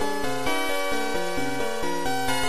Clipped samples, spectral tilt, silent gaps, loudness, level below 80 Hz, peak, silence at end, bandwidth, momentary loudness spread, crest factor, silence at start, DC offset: under 0.1%; -3 dB/octave; none; -27 LUFS; -46 dBFS; -12 dBFS; 0 s; 15 kHz; 3 LU; 14 dB; 0 s; 4%